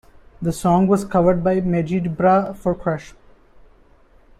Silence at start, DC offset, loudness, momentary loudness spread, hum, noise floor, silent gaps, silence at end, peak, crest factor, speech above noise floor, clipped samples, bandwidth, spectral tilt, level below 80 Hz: 0.4 s; under 0.1%; -19 LUFS; 9 LU; none; -51 dBFS; none; 1.3 s; -4 dBFS; 16 dB; 33 dB; under 0.1%; 13.5 kHz; -8 dB/octave; -44 dBFS